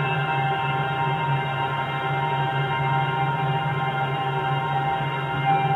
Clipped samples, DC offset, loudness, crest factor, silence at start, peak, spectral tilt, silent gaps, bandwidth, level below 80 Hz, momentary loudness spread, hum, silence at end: under 0.1%; under 0.1%; -24 LUFS; 14 dB; 0 s; -10 dBFS; -7.5 dB/octave; none; 4.7 kHz; -56 dBFS; 2 LU; none; 0 s